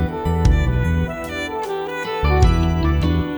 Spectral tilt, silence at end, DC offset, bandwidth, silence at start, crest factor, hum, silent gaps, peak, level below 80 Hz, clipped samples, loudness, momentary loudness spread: -7 dB/octave; 0 s; under 0.1%; over 20 kHz; 0 s; 16 dB; none; none; -2 dBFS; -22 dBFS; under 0.1%; -20 LUFS; 8 LU